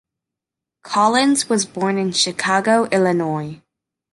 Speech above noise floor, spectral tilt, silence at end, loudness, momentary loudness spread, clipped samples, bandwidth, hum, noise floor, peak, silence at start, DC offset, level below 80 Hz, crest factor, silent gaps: 68 dB; -3.5 dB/octave; 0.6 s; -18 LUFS; 8 LU; under 0.1%; 12 kHz; none; -85 dBFS; -2 dBFS; 0.85 s; under 0.1%; -64 dBFS; 16 dB; none